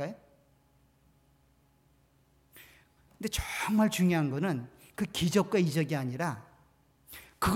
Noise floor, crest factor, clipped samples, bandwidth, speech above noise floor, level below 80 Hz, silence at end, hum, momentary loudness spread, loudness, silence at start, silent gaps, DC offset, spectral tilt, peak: -67 dBFS; 18 dB; under 0.1%; 17 kHz; 38 dB; -52 dBFS; 0 s; none; 19 LU; -30 LUFS; 0 s; none; under 0.1%; -5.5 dB/octave; -14 dBFS